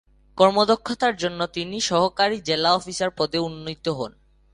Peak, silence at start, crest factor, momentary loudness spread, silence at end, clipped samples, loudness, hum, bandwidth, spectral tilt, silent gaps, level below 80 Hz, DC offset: -2 dBFS; 0.35 s; 20 dB; 11 LU; 0.45 s; under 0.1%; -22 LUFS; none; 11.5 kHz; -4 dB/octave; none; -56 dBFS; under 0.1%